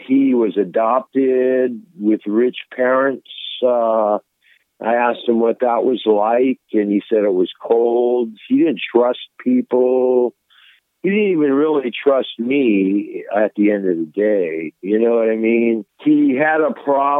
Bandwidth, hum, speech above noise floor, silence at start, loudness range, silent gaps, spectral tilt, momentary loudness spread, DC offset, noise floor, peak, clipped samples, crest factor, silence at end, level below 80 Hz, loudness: 4 kHz; none; 41 dB; 0 s; 1 LU; none; -9 dB/octave; 6 LU; under 0.1%; -57 dBFS; 0 dBFS; under 0.1%; 16 dB; 0 s; -78 dBFS; -17 LUFS